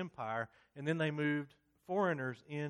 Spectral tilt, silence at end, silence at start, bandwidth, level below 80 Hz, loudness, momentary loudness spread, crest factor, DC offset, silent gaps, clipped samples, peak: -7 dB/octave; 0 s; 0 s; 9.8 kHz; -80 dBFS; -38 LUFS; 8 LU; 16 dB; under 0.1%; none; under 0.1%; -22 dBFS